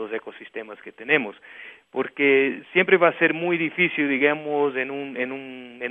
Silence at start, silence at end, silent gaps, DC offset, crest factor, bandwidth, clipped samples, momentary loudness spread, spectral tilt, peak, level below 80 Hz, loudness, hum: 0 s; 0 s; none; under 0.1%; 22 dB; 3.9 kHz; under 0.1%; 19 LU; -8 dB/octave; -2 dBFS; -74 dBFS; -21 LUFS; none